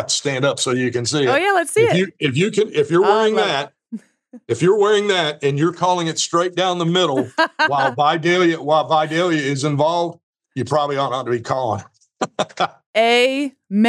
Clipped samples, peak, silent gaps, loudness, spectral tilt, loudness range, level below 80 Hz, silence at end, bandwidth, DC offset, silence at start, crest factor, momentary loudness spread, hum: under 0.1%; -2 dBFS; 10.23-10.33 s, 12.86-12.94 s; -18 LUFS; -4.5 dB/octave; 3 LU; -72 dBFS; 0 s; 13 kHz; under 0.1%; 0 s; 16 dB; 8 LU; none